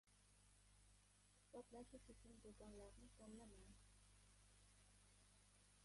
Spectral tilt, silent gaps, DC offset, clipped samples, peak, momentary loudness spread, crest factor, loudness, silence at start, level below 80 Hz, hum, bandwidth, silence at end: -4.5 dB/octave; none; under 0.1%; under 0.1%; -48 dBFS; 5 LU; 18 dB; -64 LUFS; 0.05 s; -74 dBFS; 50 Hz at -70 dBFS; 11.5 kHz; 0 s